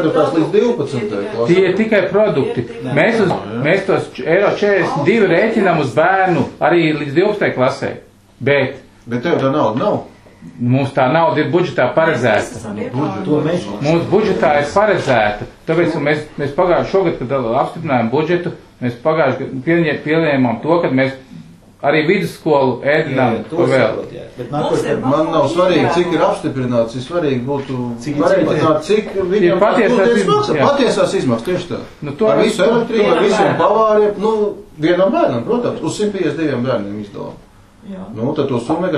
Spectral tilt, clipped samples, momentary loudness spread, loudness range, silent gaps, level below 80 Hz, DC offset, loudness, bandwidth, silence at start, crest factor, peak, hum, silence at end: -6.5 dB/octave; under 0.1%; 9 LU; 3 LU; none; -46 dBFS; under 0.1%; -15 LUFS; 12.5 kHz; 0 s; 14 dB; 0 dBFS; none; 0 s